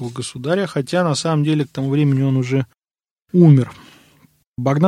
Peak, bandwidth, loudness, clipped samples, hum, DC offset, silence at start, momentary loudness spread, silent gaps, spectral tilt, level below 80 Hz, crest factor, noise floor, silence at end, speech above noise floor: -2 dBFS; 11 kHz; -18 LUFS; under 0.1%; none; under 0.1%; 0 s; 14 LU; 3.11-3.16 s, 4.47-4.52 s; -7 dB/octave; -58 dBFS; 16 dB; under -90 dBFS; 0 s; over 74 dB